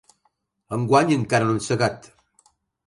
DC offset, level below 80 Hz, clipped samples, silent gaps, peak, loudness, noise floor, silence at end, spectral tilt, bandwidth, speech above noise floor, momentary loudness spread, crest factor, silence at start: under 0.1%; -58 dBFS; under 0.1%; none; -4 dBFS; -21 LUFS; -70 dBFS; 0.9 s; -5.5 dB/octave; 11.5 kHz; 49 dB; 11 LU; 20 dB; 0.7 s